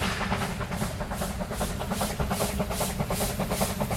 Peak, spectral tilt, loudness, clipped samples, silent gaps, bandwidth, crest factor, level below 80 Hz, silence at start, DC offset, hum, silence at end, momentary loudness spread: -12 dBFS; -4.5 dB/octave; -30 LUFS; under 0.1%; none; 16.5 kHz; 16 dB; -38 dBFS; 0 s; under 0.1%; none; 0 s; 4 LU